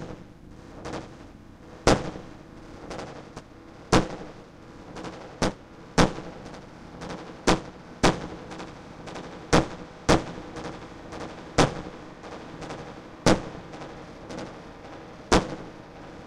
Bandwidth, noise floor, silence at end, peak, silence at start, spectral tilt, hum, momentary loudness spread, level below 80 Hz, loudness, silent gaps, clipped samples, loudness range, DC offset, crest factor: 16 kHz; -46 dBFS; 0 s; 0 dBFS; 0 s; -4.5 dB/octave; none; 21 LU; -42 dBFS; -28 LUFS; none; under 0.1%; 4 LU; under 0.1%; 28 dB